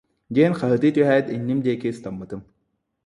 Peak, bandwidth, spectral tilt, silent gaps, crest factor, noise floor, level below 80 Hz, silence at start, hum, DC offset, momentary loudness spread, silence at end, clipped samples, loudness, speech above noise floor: -4 dBFS; 11 kHz; -8 dB/octave; none; 18 dB; -73 dBFS; -60 dBFS; 0.3 s; none; under 0.1%; 16 LU; 0.65 s; under 0.1%; -21 LUFS; 52 dB